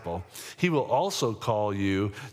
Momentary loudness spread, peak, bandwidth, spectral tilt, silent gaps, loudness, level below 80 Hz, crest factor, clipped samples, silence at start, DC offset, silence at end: 11 LU; -10 dBFS; 16.5 kHz; -5.5 dB/octave; none; -28 LUFS; -64 dBFS; 18 dB; under 0.1%; 0 s; under 0.1%; 0 s